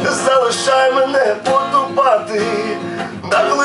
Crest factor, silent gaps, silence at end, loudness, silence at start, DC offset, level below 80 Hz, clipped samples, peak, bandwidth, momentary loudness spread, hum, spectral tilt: 14 dB; none; 0 s; -15 LUFS; 0 s; under 0.1%; -70 dBFS; under 0.1%; 0 dBFS; 11.5 kHz; 8 LU; none; -3 dB/octave